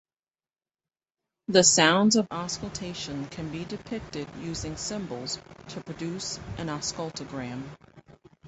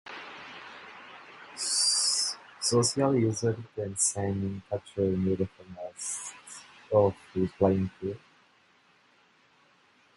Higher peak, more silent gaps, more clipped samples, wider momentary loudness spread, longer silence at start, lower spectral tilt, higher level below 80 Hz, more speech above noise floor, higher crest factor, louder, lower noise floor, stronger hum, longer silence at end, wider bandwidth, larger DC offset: about the same, -6 dBFS vs -8 dBFS; neither; neither; about the same, 18 LU vs 20 LU; first, 1.5 s vs 0.05 s; about the same, -3 dB/octave vs -4 dB/octave; about the same, -54 dBFS vs -54 dBFS; first, over 62 dB vs 35 dB; about the same, 24 dB vs 22 dB; about the same, -27 LUFS vs -28 LUFS; first, under -90 dBFS vs -64 dBFS; neither; second, 0 s vs 2 s; second, 8.4 kHz vs 11.5 kHz; neither